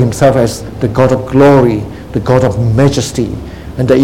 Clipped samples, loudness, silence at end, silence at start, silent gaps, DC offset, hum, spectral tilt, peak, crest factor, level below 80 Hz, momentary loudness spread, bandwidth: 0.7%; -11 LUFS; 0 s; 0 s; none; 0.7%; none; -7 dB/octave; 0 dBFS; 10 dB; -30 dBFS; 12 LU; 16 kHz